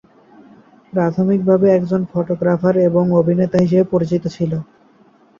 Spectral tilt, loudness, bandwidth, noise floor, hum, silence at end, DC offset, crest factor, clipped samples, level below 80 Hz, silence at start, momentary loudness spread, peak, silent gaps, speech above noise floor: -9.5 dB/octave; -16 LUFS; 7.2 kHz; -51 dBFS; none; 0.75 s; under 0.1%; 14 dB; under 0.1%; -54 dBFS; 0.95 s; 8 LU; -2 dBFS; none; 36 dB